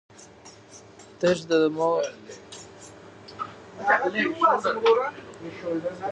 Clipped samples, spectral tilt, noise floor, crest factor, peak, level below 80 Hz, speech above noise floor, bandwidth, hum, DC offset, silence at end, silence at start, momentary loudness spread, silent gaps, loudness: under 0.1%; -4.5 dB/octave; -49 dBFS; 20 dB; -8 dBFS; -66 dBFS; 25 dB; 9.6 kHz; none; under 0.1%; 0 s; 0.2 s; 23 LU; none; -24 LUFS